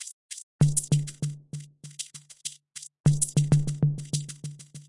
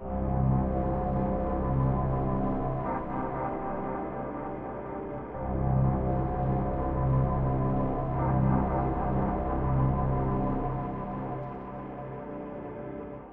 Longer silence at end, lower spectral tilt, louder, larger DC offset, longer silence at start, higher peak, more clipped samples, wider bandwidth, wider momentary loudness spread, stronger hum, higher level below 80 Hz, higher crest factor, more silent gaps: about the same, 0.05 s vs 0 s; second, -5.5 dB/octave vs -12.5 dB/octave; first, -27 LUFS vs -30 LUFS; neither; about the same, 0 s vs 0 s; first, -8 dBFS vs -14 dBFS; neither; first, 11.5 kHz vs 3.3 kHz; first, 18 LU vs 12 LU; neither; second, -54 dBFS vs -36 dBFS; first, 20 dB vs 14 dB; first, 0.13-0.29 s, 0.43-0.59 s, 3.00-3.04 s vs none